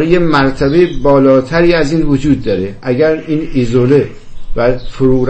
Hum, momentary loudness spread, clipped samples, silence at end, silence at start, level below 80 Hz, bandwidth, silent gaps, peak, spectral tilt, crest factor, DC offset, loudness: none; 7 LU; under 0.1%; 0 s; 0 s; -26 dBFS; 8.6 kHz; none; 0 dBFS; -7.5 dB/octave; 10 dB; under 0.1%; -12 LUFS